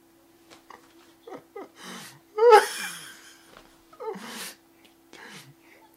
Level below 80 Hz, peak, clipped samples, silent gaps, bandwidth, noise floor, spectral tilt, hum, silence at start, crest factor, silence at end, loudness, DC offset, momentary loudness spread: -76 dBFS; -2 dBFS; under 0.1%; none; 16 kHz; -58 dBFS; -2 dB/octave; none; 1.3 s; 26 dB; 1.45 s; -22 LUFS; under 0.1%; 29 LU